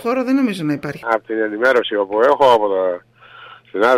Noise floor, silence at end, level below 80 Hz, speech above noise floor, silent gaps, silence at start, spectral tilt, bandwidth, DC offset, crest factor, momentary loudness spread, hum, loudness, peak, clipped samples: -41 dBFS; 0 s; -58 dBFS; 25 dB; none; 0 s; -5.5 dB/octave; 15 kHz; under 0.1%; 14 dB; 10 LU; none; -17 LUFS; -4 dBFS; under 0.1%